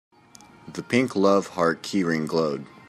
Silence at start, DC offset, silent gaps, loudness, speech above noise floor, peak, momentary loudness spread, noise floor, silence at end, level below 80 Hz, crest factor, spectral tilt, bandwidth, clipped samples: 0.65 s; under 0.1%; none; -23 LUFS; 28 dB; -6 dBFS; 8 LU; -51 dBFS; 0.25 s; -66 dBFS; 18 dB; -5.5 dB/octave; 13.5 kHz; under 0.1%